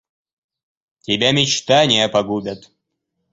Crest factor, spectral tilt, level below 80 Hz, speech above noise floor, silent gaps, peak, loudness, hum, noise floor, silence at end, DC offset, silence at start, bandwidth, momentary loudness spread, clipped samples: 18 dB; -3.5 dB/octave; -56 dBFS; 58 dB; none; -2 dBFS; -16 LUFS; none; -75 dBFS; 0.75 s; under 0.1%; 1.1 s; 8 kHz; 18 LU; under 0.1%